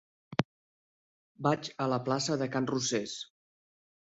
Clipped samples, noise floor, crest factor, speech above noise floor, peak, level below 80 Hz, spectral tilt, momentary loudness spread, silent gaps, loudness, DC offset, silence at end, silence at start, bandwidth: under 0.1%; under -90 dBFS; 28 dB; over 59 dB; -6 dBFS; -70 dBFS; -4.5 dB/octave; 10 LU; 0.45-1.35 s; -32 LUFS; under 0.1%; 0.9 s; 0.3 s; 8.4 kHz